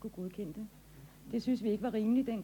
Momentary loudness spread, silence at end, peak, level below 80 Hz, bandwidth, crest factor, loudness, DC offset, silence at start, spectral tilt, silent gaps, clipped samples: 23 LU; 0 s; -22 dBFS; -62 dBFS; 19 kHz; 14 dB; -35 LUFS; under 0.1%; 0 s; -7.5 dB/octave; none; under 0.1%